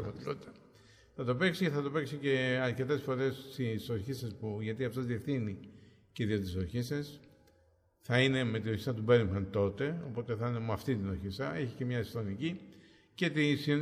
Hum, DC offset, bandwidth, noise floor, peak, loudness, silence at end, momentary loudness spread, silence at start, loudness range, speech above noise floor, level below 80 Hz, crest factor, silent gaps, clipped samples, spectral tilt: none; under 0.1%; 15.5 kHz; -69 dBFS; -14 dBFS; -34 LUFS; 0 s; 11 LU; 0 s; 5 LU; 35 dB; -62 dBFS; 20 dB; none; under 0.1%; -6.5 dB/octave